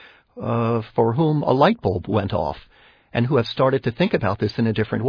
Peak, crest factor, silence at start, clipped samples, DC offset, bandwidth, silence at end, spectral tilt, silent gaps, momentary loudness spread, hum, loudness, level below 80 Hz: -2 dBFS; 18 dB; 0.35 s; under 0.1%; under 0.1%; 5.4 kHz; 0 s; -9 dB/octave; none; 8 LU; none; -21 LUFS; -48 dBFS